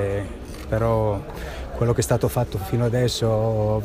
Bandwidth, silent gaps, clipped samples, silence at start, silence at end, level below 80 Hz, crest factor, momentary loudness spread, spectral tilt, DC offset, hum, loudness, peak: 15.5 kHz; none; under 0.1%; 0 s; 0 s; -36 dBFS; 16 dB; 12 LU; -6 dB/octave; under 0.1%; none; -23 LUFS; -6 dBFS